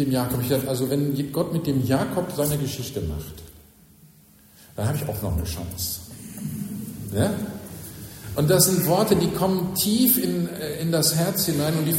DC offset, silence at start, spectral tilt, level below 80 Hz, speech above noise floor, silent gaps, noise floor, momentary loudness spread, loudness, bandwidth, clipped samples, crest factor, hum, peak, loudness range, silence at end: under 0.1%; 0 s; -5 dB/octave; -44 dBFS; 30 dB; none; -53 dBFS; 16 LU; -23 LUFS; 16.5 kHz; under 0.1%; 20 dB; none; -4 dBFS; 10 LU; 0 s